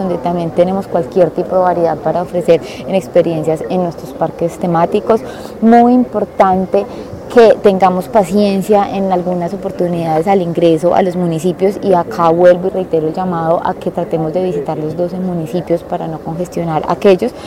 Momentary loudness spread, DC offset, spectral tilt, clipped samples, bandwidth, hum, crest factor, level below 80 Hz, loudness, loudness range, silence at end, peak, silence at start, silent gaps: 9 LU; under 0.1%; -7.5 dB/octave; under 0.1%; 16 kHz; none; 12 dB; -44 dBFS; -13 LUFS; 5 LU; 0 s; 0 dBFS; 0 s; none